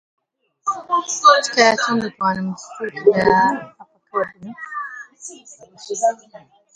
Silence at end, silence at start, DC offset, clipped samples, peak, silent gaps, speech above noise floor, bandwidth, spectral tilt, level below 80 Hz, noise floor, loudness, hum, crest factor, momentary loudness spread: 0.4 s; 0.65 s; under 0.1%; under 0.1%; 0 dBFS; none; 23 dB; 10 kHz; -3 dB/octave; -58 dBFS; -41 dBFS; -18 LUFS; none; 20 dB; 21 LU